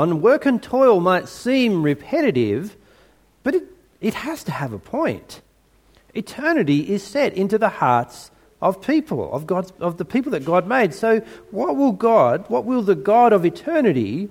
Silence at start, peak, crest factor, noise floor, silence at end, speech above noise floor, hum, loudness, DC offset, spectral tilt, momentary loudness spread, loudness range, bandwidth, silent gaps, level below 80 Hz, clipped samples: 0 s; -2 dBFS; 18 dB; -57 dBFS; 0 s; 38 dB; none; -19 LUFS; under 0.1%; -6.5 dB/octave; 11 LU; 8 LU; 16.5 kHz; none; -58 dBFS; under 0.1%